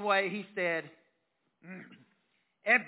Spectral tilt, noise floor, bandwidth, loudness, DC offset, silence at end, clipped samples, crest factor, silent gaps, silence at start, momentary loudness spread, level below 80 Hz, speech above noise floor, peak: -2 dB/octave; -79 dBFS; 4 kHz; -32 LUFS; under 0.1%; 0 s; under 0.1%; 22 dB; none; 0 s; 21 LU; under -90 dBFS; 45 dB; -12 dBFS